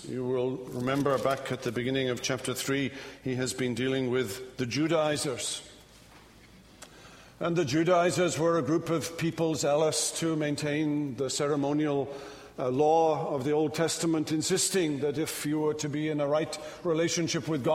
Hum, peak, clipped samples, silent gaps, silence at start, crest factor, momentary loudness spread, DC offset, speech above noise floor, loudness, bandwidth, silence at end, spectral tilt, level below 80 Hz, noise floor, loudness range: none; -12 dBFS; under 0.1%; none; 0 s; 18 dB; 8 LU; under 0.1%; 26 dB; -29 LUFS; 16 kHz; 0 s; -4.5 dB/octave; -62 dBFS; -54 dBFS; 4 LU